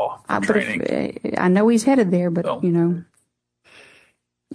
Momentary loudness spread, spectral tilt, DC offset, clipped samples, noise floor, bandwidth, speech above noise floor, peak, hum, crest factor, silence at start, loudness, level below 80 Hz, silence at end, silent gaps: 8 LU; -6.5 dB/octave; under 0.1%; under 0.1%; -67 dBFS; 11 kHz; 48 dB; -4 dBFS; none; 16 dB; 0 s; -20 LUFS; -60 dBFS; 0 s; none